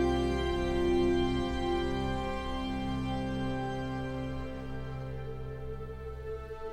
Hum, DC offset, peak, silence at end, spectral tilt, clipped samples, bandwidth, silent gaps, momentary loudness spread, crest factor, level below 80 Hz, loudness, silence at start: none; under 0.1%; -18 dBFS; 0 s; -7 dB/octave; under 0.1%; 12 kHz; none; 12 LU; 16 dB; -40 dBFS; -34 LUFS; 0 s